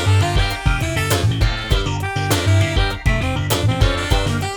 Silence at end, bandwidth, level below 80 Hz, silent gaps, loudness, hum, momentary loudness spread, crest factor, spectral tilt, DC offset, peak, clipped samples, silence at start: 0 s; over 20 kHz; -24 dBFS; none; -18 LUFS; none; 4 LU; 14 dB; -5 dB/octave; under 0.1%; -2 dBFS; under 0.1%; 0 s